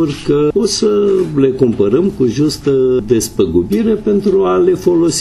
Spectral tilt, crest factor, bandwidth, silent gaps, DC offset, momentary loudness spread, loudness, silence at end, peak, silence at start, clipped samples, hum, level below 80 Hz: -6 dB/octave; 12 dB; 13.5 kHz; none; under 0.1%; 2 LU; -13 LUFS; 0 s; 0 dBFS; 0 s; under 0.1%; none; -38 dBFS